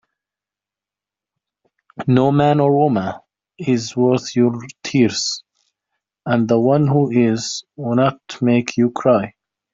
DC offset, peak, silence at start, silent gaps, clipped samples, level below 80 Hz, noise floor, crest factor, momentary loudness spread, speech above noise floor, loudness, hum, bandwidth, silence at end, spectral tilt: under 0.1%; -2 dBFS; 2 s; none; under 0.1%; -58 dBFS; -88 dBFS; 16 dB; 12 LU; 72 dB; -17 LUFS; none; 7.8 kHz; 0.45 s; -6 dB/octave